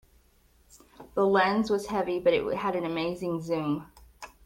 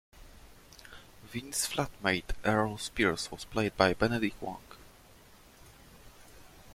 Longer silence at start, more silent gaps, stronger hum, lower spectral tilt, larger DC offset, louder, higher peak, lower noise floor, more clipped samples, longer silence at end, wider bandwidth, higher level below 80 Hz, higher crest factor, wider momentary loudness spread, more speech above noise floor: first, 0.75 s vs 0.15 s; neither; neither; first, -6 dB/octave vs -4 dB/octave; neither; first, -28 LUFS vs -31 LUFS; second, -12 dBFS vs -8 dBFS; first, -62 dBFS vs -57 dBFS; neither; first, 0.2 s vs 0 s; about the same, 16.5 kHz vs 16.5 kHz; second, -58 dBFS vs -50 dBFS; second, 18 dB vs 26 dB; second, 11 LU vs 24 LU; first, 36 dB vs 26 dB